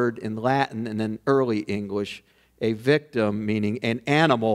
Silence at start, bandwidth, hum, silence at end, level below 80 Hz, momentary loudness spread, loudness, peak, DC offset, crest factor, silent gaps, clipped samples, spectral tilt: 0 s; 13.5 kHz; none; 0 s; -64 dBFS; 9 LU; -24 LUFS; -4 dBFS; under 0.1%; 20 dB; none; under 0.1%; -6.5 dB/octave